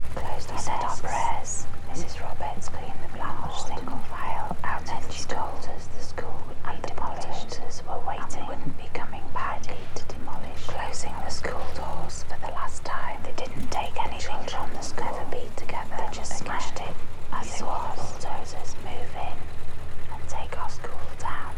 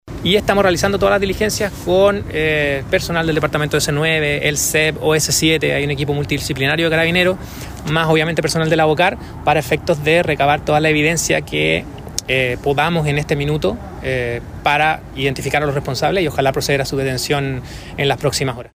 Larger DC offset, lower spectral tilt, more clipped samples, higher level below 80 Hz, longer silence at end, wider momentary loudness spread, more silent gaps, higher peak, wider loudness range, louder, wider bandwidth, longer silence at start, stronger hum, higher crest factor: neither; about the same, -4 dB/octave vs -4 dB/octave; neither; about the same, -34 dBFS vs -36 dBFS; about the same, 0 s vs 0.1 s; about the same, 7 LU vs 6 LU; neither; second, -10 dBFS vs -2 dBFS; about the same, 3 LU vs 3 LU; second, -34 LUFS vs -16 LUFS; second, 9.6 kHz vs 16 kHz; about the same, 0 s vs 0.05 s; neither; about the same, 10 dB vs 14 dB